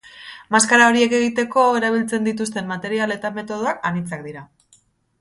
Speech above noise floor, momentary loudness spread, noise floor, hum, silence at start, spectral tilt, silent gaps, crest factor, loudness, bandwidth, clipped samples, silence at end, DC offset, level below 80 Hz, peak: 39 dB; 18 LU; -58 dBFS; none; 0.05 s; -3.5 dB/octave; none; 20 dB; -18 LUFS; 11.5 kHz; under 0.1%; 0.75 s; under 0.1%; -62 dBFS; 0 dBFS